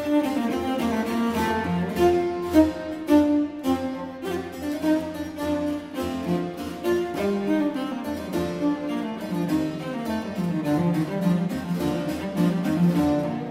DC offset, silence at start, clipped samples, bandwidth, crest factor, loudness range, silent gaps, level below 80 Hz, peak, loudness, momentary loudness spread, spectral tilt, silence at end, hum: under 0.1%; 0 s; under 0.1%; 16 kHz; 18 dB; 4 LU; none; -50 dBFS; -6 dBFS; -25 LUFS; 9 LU; -7 dB/octave; 0 s; none